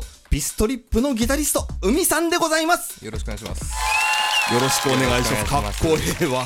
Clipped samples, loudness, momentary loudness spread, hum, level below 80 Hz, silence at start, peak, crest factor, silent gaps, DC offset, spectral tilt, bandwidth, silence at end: under 0.1%; -20 LUFS; 11 LU; none; -32 dBFS; 0 s; -4 dBFS; 16 dB; none; under 0.1%; -3.5 dB/octave; 18 kHz; 0 s